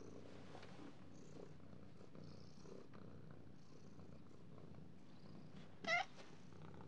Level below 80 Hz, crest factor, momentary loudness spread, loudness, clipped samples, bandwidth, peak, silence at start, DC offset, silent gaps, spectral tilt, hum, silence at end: -80 dBFS; 26 dB; 19 LU; -53 LUFS; under 0.1%; 10 kHz; -28 dBFS; 0 s; 0.1%; none; -4.5 dB/octave; none; 0 s